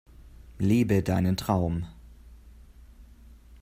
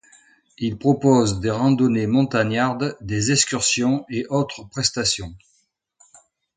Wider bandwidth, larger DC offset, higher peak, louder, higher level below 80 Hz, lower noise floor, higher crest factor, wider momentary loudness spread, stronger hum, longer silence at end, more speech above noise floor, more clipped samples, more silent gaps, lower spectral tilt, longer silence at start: first, 16 kHz vs 9.6 kHz; neither; second, -10 dBFS vs -2 dBFS; second, -26 LUFS vs -20 LUFS; about the same, -48 dBFS vs -50 dBFS; second, -51 dBFS vs -67 dBFS; about the same, 20 dB vs 18 dB; about the same, 10 LU vs 9 LU; neither; second, 0.05 s vs 1.2 s; second, 26 dB vs 46 dB; neither; neither; first, -7.5 dB/octave vs -4.5 dB/octave; second, 0.2 s vs 0.6 s